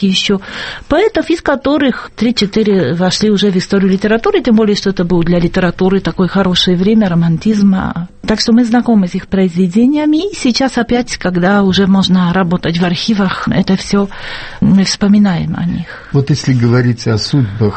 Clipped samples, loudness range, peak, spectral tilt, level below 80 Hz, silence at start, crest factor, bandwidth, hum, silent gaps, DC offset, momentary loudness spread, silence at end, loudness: under 0.1%; 1 LU; 0 dBFS; -6 dB/octave; -34 dBFS; 0 s; 12 dB; 8.6 kHz; none; none; under 0.1%; 6 LU; 0 s; -12 LUFS